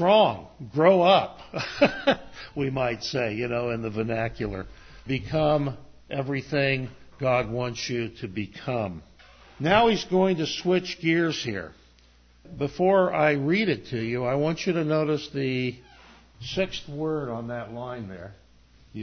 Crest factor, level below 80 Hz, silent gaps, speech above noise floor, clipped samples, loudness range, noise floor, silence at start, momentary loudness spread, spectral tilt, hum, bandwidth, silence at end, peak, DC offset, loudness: 20 dB; -52 dBFS; none; 32 dB; under 0.1%; 5 LU; -57 dBFS; 0 s; 15 LU; -6 dB/octave; none; 6.6 kHz; 0 s; -6 dBFS; under 0.1%; -26 LUFS